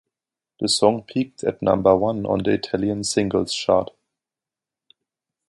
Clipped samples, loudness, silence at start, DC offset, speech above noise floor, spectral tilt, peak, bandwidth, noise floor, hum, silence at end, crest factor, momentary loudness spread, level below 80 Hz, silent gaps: under 0.1%; -21 LUFS; 0.6 s; under 0.1%; 69 dB; -4.5 dB/octave; -2 dBFS; 11.5 kHz; -89 dBFS; none; 1.65 s; 22 dB; 8 LU; -52 dBFS; none